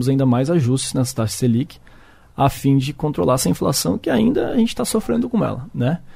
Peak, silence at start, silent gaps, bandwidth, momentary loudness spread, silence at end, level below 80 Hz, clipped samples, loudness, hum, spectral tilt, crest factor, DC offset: -4 dBFS; 0 s; none; 16 kHz; 5 LU; 0 s; -42 dBFS; under 0.1%; -19 LUFS; none; -6 dB/octave; 14 dB; under 0.1%